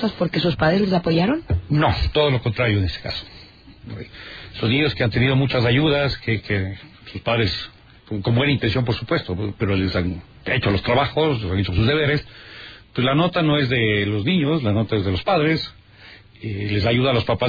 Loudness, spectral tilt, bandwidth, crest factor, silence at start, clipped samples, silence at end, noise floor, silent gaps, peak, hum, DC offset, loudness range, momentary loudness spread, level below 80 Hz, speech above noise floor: -20 LUFS; -8 dB/octave; 5 kHz; 14 dB; 0 s; under 0.1%; 0 s; -45 dBFS; none; -6 dBFS; none; under 0.1%; 3 LU; 14 LU; -38 dBFS; 25 dB